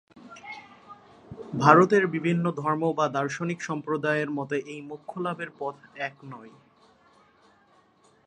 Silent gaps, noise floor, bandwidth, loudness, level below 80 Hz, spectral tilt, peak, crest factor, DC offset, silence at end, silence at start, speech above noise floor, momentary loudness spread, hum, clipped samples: none; -61 dBFS; 9.6 kHz; -26 LUFS; -70 dBFS; -6.5 dB/octave; -2 dBFS; 26 dB; under 0.1%; 1.75 s; 0.25 s; 36 dB; 25 LU; none; under 0.1%